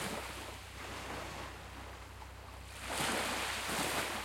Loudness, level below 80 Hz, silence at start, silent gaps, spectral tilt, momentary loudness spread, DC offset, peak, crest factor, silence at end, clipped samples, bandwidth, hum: -39 LUFS; -54 dBFS; 0 s; none; -2.5 dB/octave; 15 LU; under 0.1%; -22 dBFS; 20 dB; 0 s; under 0.1%; 16.5 kHz; none